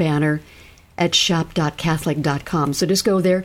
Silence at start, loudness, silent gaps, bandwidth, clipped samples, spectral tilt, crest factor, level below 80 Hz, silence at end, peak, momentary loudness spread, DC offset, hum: 0 s; -19 LUFS; none; 17 kHz; under 0.1%; -4.5 dB/octave; 16 dB; -46 dBFS; 0 s; -4 dBFS; 6 LU; under 0.1%; none